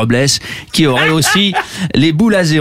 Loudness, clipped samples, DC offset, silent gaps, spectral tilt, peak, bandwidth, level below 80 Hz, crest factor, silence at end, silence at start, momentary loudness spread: -12 LUFS; under 0.1%; 0.7%; none; -4 dB/octave; 0 dBFS; 16 kHz; -42 dBFS; 12 dB; 0 s; 0 s; 6 LU